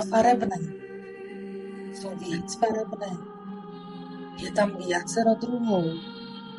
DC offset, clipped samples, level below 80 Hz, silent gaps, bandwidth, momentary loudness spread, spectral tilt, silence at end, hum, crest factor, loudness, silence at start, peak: under 0.1%; under 0.1%; -62 dBFS; none; 11.5 kHz; 16 LU; -5 dB/octave; 0 s; none; 18 dB; -28 LUFS; 0 s; -10 dBFS